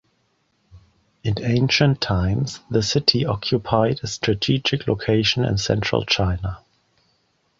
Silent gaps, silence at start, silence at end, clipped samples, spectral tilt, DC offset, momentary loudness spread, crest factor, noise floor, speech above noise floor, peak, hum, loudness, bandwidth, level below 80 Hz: none; 0.75 s; 1 s; under 0.1%; -5 dB/octave; under 0.1%; 8 LU; 20 dB; -67 dBFS; 46 dB; -2 dBFS; none; -21 LUFS; 7.8 kHz; -40 dBFS